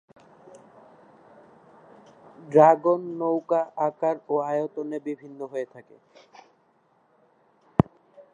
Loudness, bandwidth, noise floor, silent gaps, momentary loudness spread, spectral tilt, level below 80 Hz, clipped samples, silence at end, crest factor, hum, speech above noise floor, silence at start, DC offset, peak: -24 LUFS; 7.6 kHz; -65 dBFS; none; 17 LU; -9 dB/octave; -56 dBFS; under 0.1%; 0.1 s; 26 dB; none; 41 dB; 2.45 s; under 0.1%; 0 dBFS